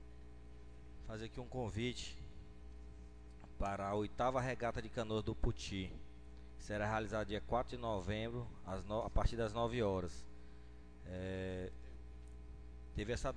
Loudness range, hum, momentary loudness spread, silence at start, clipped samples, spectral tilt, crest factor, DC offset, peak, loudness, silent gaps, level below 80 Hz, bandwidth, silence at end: 7 LU; none; 20 LU; 0 s; under 0.1%; -6 dB/octave; 22 dB; 0.1%; -20 dBFS; -42 LUFS; none; -50 dBFS; 10 kHz; 0 s